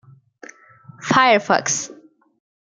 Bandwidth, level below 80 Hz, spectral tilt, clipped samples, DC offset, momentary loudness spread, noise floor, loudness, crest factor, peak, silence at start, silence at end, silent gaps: 10 kHz; -64 dBFS; -2.5 dB/octave; under 0.1%; under 0.1%; 18 LU; -46 dBFS; -17 LUFS; 20 dB; -2 dBFS; 1 s; 0.85 s; none